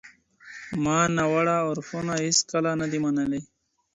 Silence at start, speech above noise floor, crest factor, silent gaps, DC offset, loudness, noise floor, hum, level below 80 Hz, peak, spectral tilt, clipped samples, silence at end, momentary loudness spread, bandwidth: 0.05 s; 25 dB; 18 dB; none; under 0.1%; -25 LUFS; -49 dBFS; none; -58 dBFS; -8 dBFS; -4 dB/octave; under 0.1%; 0.5 s; 11 LU; 10.5 kHz